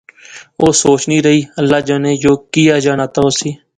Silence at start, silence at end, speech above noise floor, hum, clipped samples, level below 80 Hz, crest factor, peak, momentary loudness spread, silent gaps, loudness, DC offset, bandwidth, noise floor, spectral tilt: 0.3 s; 0.2 s; 25 dB; none; under 0.1%; -46 dBFS; 12 dB; 0 dBFS; 4 LU; none; -12 LUFS; under 0.1%; 11 kHz; -37 dBFS; -4.5 dB/octave